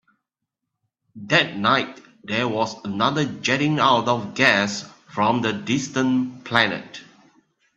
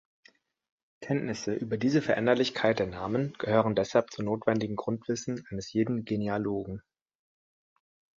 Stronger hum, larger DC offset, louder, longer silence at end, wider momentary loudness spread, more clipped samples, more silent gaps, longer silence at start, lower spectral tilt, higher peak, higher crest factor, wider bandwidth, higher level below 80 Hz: neither; neither; first, -21 LUFS vs -29 LUFS; second, 0.75 s vs 1.4 s; first, 14 LU vs 8 LU; neither; neither; first, 1.15 s vs 1 s; second, -4.5 dB/octave vs -6 dB/octave; first, 0 dBFS vs -8 dBFS; about the same, 22 dB vs 22 dB; first, 8.6 kHz vs 7.8 kHz; about the same, -64 dBFS vs -60 dBFS